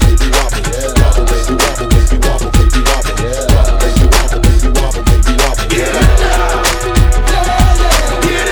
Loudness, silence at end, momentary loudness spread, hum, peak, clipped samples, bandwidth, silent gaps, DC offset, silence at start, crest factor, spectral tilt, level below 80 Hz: -12 LUFS; 0 s; 4 LU; none; 0 dBFS; 0.3%; 19.5 kHz; none; under 0.1%; 0 s; 10 dB; -4.5 dB/octave; -10 dBFS